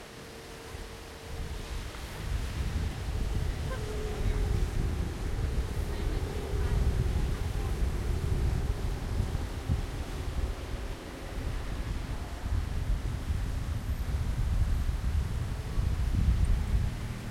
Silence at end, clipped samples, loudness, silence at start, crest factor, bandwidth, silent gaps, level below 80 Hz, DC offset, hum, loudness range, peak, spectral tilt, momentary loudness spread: 0 s; under 0.1%; -34 LUFS; 0 s; 16 dB; 15.5 kHz; none; -32 dBFS; under 0.1%; none; 5 LU; -16 dBFS; -6 dB/octave; 10 LU